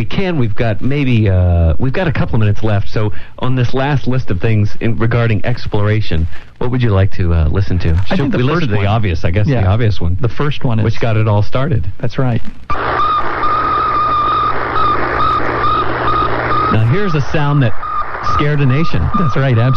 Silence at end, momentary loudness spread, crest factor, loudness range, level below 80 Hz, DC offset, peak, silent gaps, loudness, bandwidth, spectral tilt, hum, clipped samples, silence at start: 0 s; 5 LU; 8 dB; 2 LU; -26 dBFS; under 0.1%; -2 dBFS; none; -15 LUFS; 6.4 kHz; -8 dB/octave; none; under 0.1%; 0 s